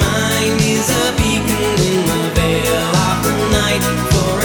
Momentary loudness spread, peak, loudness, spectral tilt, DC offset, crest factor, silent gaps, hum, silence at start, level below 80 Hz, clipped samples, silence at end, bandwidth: 2 LU; 0 dBFS; -15 LUFS; -4 dB/octave; under 0.1%; 14 dB; none; none; 0 s; -28 dBFS; under 0.1%; 0 s; over 20 kHz